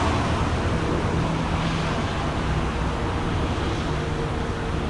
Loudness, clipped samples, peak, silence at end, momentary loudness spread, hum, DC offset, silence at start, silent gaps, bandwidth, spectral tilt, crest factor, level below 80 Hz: -25 LUFS; under 0.1%; -10 dBFS; 0 s; 3 LU; none; under 0.1%; 0 s; none; 11.5 kHz; -6 dB/octave; 14 dB; -32 dBFS